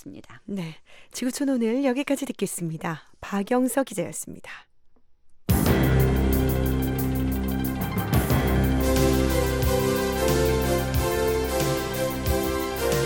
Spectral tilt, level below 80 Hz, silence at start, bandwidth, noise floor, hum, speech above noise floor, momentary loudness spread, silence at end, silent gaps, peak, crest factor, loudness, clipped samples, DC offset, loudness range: -5.5 dB/octave; -32 dBFS; 0.05 s; 17.5 kHz; -52 dBFS; none; 25 dB; 12 LU; 0 s; none; -8 dBFS; 16 dB; -24 LUFS; under 0.1%; under 0.1%; 5 LU